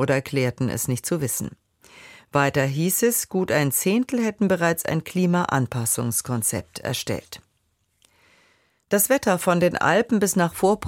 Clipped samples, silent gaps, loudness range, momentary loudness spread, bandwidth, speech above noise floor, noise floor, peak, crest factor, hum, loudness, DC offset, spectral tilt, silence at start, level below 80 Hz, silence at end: under 0.1%; none; 5 LU; 8 LU; 17 kHz; 48 dB; -70 dBFS; -4 dBFS; 18 dB; none; -22 LUFS; under 0.1%; -4.5 dB/octave; 0 s; -56 dBFS; 0 s